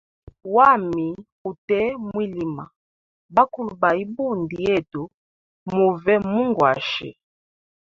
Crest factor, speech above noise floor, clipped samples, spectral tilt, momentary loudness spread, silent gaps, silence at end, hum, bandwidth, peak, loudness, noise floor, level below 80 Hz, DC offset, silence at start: 20 dB; over 69 dB; under 0.1%; -7 dB/octave; 17 LU; 1.32-1.45 s, 1.58-1.68 s, 2.76-3.29 s, 5.14-5.66 s; 0.7 s; none; 7.4 kHz; -2 dBFS; -21 LUFS; under -90 dBFS; -56 dBFS; under 0.1%; 0.45 s